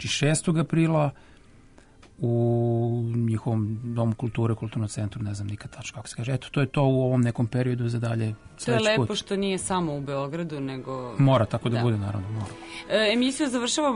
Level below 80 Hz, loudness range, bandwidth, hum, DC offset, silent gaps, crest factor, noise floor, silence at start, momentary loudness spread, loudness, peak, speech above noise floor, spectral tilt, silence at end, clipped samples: -54 dBFS; 3 LU; 11 kHz; none; under 0.1%; none; 14 dB; -53 dBFS; 0 s; 11 LU; -26 LUFS; -12 dBFS; 27 dB; -5.5 dB/octave; 0 s; under 0.1%